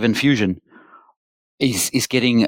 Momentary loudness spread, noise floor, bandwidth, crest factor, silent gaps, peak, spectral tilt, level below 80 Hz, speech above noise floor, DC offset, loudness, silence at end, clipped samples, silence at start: 6 LU; -48 dBFS; 17 kHz; 16 dB; 1.17-1.58 s; -4 dBFS; -4 dB/octave; -56 dBFS; 31 dB; under 0.1%; -19 LUFS; 0 s; under 0.1%; 0 s